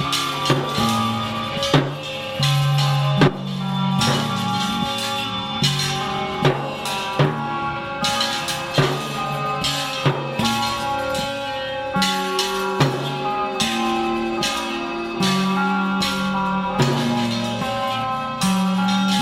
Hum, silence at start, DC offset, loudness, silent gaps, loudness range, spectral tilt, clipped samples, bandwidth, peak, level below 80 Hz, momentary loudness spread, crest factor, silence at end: none; 0 s; under 0.1%; -21 LUFS; none; 2 LU; -4.5 dB/octave; under 0.1%; 16.5 kHz; -2 dBFS; -48 dBFS; 6 LU; 18 dB; 0 s